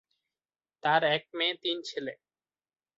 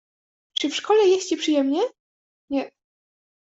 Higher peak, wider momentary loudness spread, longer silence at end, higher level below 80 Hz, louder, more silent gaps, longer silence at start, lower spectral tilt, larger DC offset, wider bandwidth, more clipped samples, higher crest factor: about the same, -10 dBFS vs -8 dBFS; about the same, 12 LU vs 11 LU; about the same, 0.85 s vs 0.75 s; second, -78 dBFS vs -70 dBFS; second, -29 LUFS vs -22 LUFS; second, none vs 2.00-2.48 s; first, 0.85 s vs 0.6 s; first, -4 dB/octave vs -2 dB/octave; neither; about the same, 7.8 kHz vs 8 kHz; neither; first, 24 dB vs 16 dB